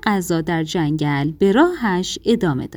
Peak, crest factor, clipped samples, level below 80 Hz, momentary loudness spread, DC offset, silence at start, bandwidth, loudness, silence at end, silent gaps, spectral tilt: -2 dBFS; 16 dB; under 0.1%; -46 dBFS; 6 LU; under 0.1%; 0.05 s; over 20 kHz; -19 LUFS; 0 s; none; -6 dB/octave